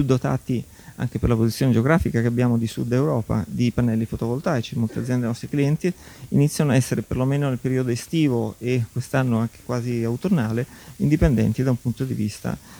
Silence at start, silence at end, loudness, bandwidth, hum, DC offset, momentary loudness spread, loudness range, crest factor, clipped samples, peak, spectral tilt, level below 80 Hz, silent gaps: 0 s; 0 s; -23 LUFS; over 20 kHz; none; under 0.1%; 7 LU; 2 LU; 16 dB; under 0.1%; -4 dBFS; -7 dB/octave; -40 dBFS; none